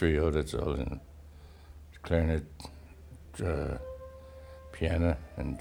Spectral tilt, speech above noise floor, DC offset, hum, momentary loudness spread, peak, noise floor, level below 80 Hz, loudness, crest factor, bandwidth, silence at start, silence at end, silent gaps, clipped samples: -7.5 dB/octave; 20 dB; under 0.1%; none; 23 LU; -12 dBFS; -51 dBFS; -40 dBFS; -32 LUFS; 22 dB; 11.5 kHz; 0 s; 0 s; none; under 0.1%